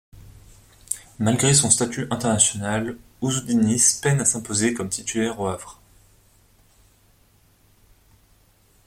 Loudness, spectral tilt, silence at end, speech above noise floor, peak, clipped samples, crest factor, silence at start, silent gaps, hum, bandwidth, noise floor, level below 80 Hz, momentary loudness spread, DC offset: -21 LUFS; -3.5 dB/octave; 3.15 s; 37 dB; -2 dBFS; under 0.1%; 22 dB; 0.15 s; none; none; 16.5 kHz; -58 dBFS; -54 dBFS; 15 LU; under 0.1%